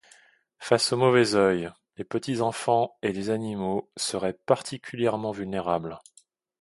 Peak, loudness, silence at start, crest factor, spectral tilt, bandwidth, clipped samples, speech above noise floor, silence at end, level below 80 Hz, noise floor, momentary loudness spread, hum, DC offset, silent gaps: -4 dBFS; -26 LUFS; 0.6 s; 22 dB; -4.5 dB/octave; 11.5 kHz; under 0.1%; 33 dB; 0.6 s; -62 dBFS; -59 dBFS; 13 LU; none; under 0.1%; none